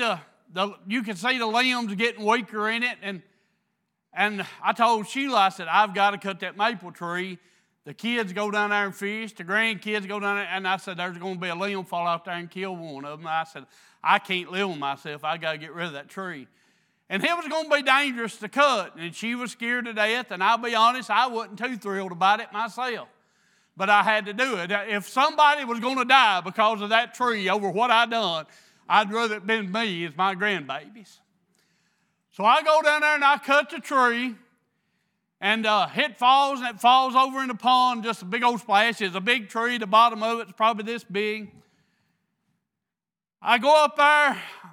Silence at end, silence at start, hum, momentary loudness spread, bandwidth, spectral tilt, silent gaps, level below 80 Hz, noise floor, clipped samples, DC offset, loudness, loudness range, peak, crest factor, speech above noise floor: 0 s; 0 s; none; 13 LU; 17 kHz; -3.5 dB/octave; none; under -90 dBFS; under -90 dBFS; under 0.1%; under 0.1%; -23 LUFS; 7 LU; -2 dBFS; 22 dB; over 66 dB